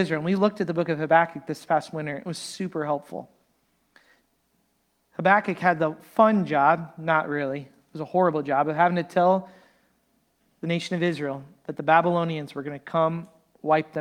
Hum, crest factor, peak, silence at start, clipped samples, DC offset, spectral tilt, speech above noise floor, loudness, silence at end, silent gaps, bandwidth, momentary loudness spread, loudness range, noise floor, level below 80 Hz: none; 20 dB; -4 dBFS; 0 s; under 0.1%; under 0.1%; -6.5 dB/octave; 47 dB; -24 LUFS; 0 s; none; 14 kHz; 14 LU; 7 LU; -70 dBFS; -70 dBFS